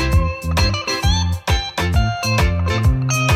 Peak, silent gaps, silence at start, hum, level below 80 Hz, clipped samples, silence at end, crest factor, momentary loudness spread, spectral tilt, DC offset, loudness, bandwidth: -4 dBFS; none; 0 s; none; -22 dBFS; under 0.1%; 0 s; 12 dB; 2 LU; -4.5 dB/octave; under 0.1%; -18 LUFS; 16 kHz